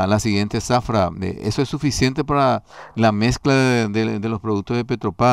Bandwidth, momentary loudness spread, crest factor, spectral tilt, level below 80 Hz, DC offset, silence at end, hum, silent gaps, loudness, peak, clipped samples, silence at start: 14 kHz; 7 LU; 14 dB; -5.5 dB/octave; -40 dBFS; 0.1%; 0 s; none; none; -20 LUFS; -6 dBFS; under 0.1%; 0 s